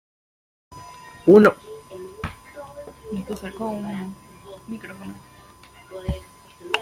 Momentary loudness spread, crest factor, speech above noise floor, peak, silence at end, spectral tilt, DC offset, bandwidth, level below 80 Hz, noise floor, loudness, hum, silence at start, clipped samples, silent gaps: 28 LU; 22 dB; 28 dB; -2 dBFS; 0 s; -6.5 dB/octave; under 0.1%; 15.5 kHz; -46 dBFS; -48 dBFS; -21 LUFS; none; 0.7 s; under 0.1%; none